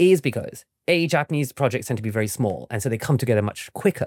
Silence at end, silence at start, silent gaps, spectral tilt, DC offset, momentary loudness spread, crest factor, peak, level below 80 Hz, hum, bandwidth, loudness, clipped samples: 0 s; 0 s; none; -6 dB/octave; under 0.1%; 8 LU; 16 dB; -6 dBFS; -62 dBFS; none; 17 kHz; -23 LUFS; under 0.1%